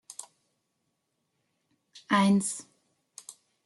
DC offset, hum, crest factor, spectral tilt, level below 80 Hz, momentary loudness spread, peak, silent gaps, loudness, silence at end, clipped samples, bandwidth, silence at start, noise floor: under 0.1%; none; 22 dB; -4.5 dB/octave; -76 dBFS; 24 LU; -12 dBFS; none; -26 LUFS; 0.35 s; under 0.1%; 12 kHz; 0.1 s; -79 dBFS